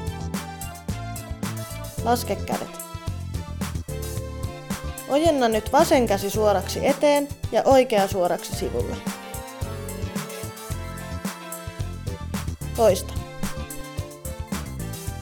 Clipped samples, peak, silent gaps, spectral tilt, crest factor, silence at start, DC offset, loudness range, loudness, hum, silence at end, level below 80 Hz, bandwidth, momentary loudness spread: under 0.1%; -6 dBFS; none; -5 dB/octave; 20 dB; 0 s; under 0.1%; 11 LU; -25 LUFS; none; 0 s; -38 dBFS; 19 kHz; 14 LU